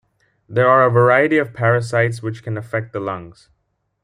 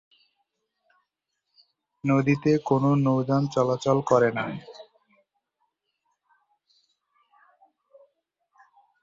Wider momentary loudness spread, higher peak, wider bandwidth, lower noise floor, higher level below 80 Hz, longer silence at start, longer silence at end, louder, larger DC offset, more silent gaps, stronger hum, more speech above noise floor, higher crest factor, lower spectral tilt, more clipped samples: first, 14 LU vs 11 LU; first, -2 dBFS vs -6 dBFS; first, 11 kHz vs 7.6 kHz; second, -69 dBFS vs -81 dBFS; about the same, -60 dBFS vs -64 dBFS; second, 0.5 s vs 2.05 s; second, 0.75 s vs 4.2 s; first, -17 LUFS vs -23 LUFS; neither; neither; neither; second, 52 dB vs 59 dB; second, 16 dB vs 22 dB; about the same, -7.5 dB/octave vs -7.5 dB/octave; neither